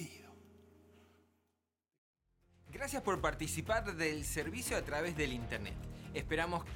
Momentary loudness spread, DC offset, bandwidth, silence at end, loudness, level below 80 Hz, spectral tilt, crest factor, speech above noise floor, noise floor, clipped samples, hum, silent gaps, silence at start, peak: 12 LU; under 0.1%; 17.5 kHz; 0 s; -38 LUFS; -52 dBFS; -4 dB/octave; 22 dB; 48 dB; -86 dBFS; under 0.1%; none; 1.98-2.13 s; 0 s; -18 dBFS